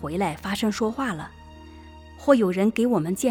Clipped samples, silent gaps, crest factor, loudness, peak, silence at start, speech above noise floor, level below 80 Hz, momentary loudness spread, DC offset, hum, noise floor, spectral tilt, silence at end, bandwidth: under 0.1%; none; 20 dB; -24 LUFS; -4 dBFS; 0 s; 21 dB; -52 dBFS; 10 LU; under 0.1%; none; -44 dBFS; -5.5 dB/octave; 0 s; 19 kHz